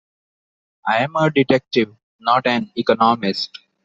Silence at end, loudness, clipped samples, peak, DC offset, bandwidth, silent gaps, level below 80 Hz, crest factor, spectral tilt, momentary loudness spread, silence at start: 0.4 s; -19 LUFS; under 0.1%; -2 dBFS; under 0.1%; 7.8 kHz; 2.03-2.19 s; -60 dBFS; 16 dB; -6 dB/octave; 10 LU; 0.85 s